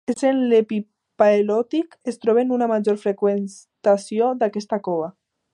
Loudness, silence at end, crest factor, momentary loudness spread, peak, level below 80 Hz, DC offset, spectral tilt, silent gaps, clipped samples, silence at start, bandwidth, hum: -21 LUFS; 0.45 s; 18 dB; 10 LU; -2 dBFS; -74 dBFS; under 0.1%; -6.5 dB/octave; none; under 0.1%; 0.1 s; 11 kHz; none